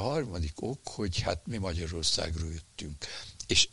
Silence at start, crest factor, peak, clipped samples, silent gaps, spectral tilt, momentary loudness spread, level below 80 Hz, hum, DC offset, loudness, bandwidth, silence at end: 0 s; 22 dB; -10 dBFS; under 0.1%; none; -3 dB/octave; 12 LU; -44 dBFS; none; under 0.1%; -33 LUFS; 11.5 kHz; 0 s